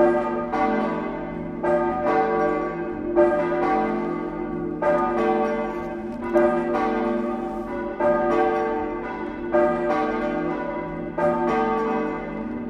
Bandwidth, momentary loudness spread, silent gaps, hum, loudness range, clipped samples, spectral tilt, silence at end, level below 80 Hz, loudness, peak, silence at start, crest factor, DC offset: 7.8 kHz; 9 LU; none; none; 1 LU; under 0.1%; -7.5 dB/octave; 0 s; -46 dBFS; -24 LUFS; -6 dBFS; 0 s; 16 dB; under 0.1%